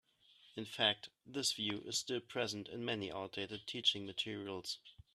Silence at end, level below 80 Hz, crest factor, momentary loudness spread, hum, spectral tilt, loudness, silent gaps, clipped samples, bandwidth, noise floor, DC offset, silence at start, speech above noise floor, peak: 0.2 s; -76 dBFS; 22 dB; 12 LU; none; -2.5 dB/octave; -39 LUFS; none; under 0.1%; 14 kHz; -68 dBFS; under 0.1%; 0.45 s; 27 dB; -18 dBFS